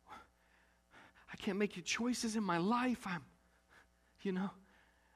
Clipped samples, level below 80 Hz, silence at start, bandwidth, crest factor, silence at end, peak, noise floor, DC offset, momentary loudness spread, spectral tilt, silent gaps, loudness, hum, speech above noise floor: under 0.1%; -72 dBFS; 0.1 s; 14.5 kHz; 18 dB; 0.55 s; -22 dBFS; -71 dBFS; under 0.1%; 12 LU; -4.5 dB/octave; none; -38 LUFS; none; 34 dB